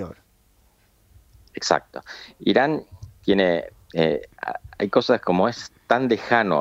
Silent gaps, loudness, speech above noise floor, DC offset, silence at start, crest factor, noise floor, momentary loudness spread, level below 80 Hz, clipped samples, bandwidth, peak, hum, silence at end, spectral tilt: none; -22 LUFS; 38 dB; under 0.1%; 0 s; 22 dB; -60 dBFS; 16 LU; -56 dBFS; under 0.1%; 15 kHz; -2 dBFS; none; 0 s; -5 dB/octave